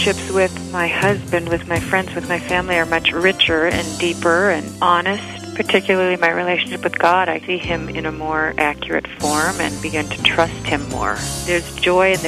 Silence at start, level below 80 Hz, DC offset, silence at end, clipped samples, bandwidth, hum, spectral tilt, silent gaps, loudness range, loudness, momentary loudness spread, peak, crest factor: 0 s; -40 dBFS; under 0.1%; 0 s; under 0.1%; 15.5 kHz; none; -4 dB/octave; none; 2 LU; -18 LUFS; 7 LU; 0 dBFS; 18 dB